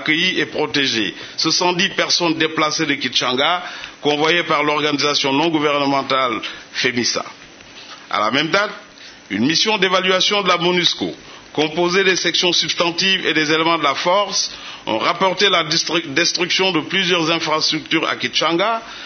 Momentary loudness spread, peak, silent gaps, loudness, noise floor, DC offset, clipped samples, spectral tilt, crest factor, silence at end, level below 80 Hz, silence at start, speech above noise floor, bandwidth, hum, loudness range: 8 LU; 0 dBFS; none; -17 LUFS; -40 dBFS; under 0.1%; under 0.1%; -2.5 dB/octave; 18 dB; 0 s; -62 dBFS; 0 s; 22 dB; 6.6 kHz; none; 3 LU